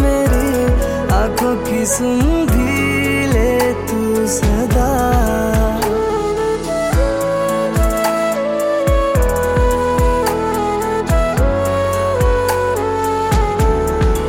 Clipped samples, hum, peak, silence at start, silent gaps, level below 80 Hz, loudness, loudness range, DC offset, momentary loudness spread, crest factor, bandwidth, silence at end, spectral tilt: under 0.1%; none; -2 dBFS; 0 s; none; -20 dBFS; -16 LUFS; 1 LU; under 0.1%; 3 LU; 12 dB; 17 kHz; 0 s; -5.5 dB/octave